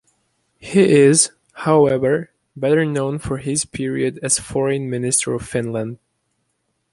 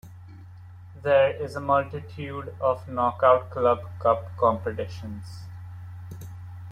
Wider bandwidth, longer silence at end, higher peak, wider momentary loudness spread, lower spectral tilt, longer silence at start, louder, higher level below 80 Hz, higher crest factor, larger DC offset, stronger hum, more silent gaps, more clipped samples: second, 11.5 kHz vs 13.5 kHz; first, 1 s vs 0 s; first, 0 dBFS vs -6 dBFS; second, 12 LU vs 23 LU; second, -4.5 dB/octave vs -7 dB/octave; first, 0.65 s vs 0.05 s; first, -18 LUFS vs -25 LUFS; first, -50 dBFS vs -58 dBFS; about the same, 18 dB vs 20 dB; neither; neither; neither; neither